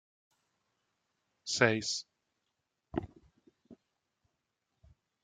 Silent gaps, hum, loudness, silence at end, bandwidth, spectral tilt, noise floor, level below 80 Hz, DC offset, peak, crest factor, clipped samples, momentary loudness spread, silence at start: none; none; -33 LUFS; 1.5 s; 9.6 kHz; -3.5 dB/octave; -84 dBFS; -66 dBFS; under 0.1%; -10 dBFS; 30 dB; under 0.1%; 22 LU; 1.45 s